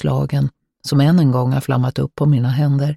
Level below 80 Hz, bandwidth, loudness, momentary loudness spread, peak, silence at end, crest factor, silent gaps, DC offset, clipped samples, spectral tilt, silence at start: -46 dBFS; 13 kHz; -17 LUFS; 7 LU; -4 dBFS; 0 s; 12 dB; none; under 0.1%; under 0.1%; -8 dB/octave; 0 s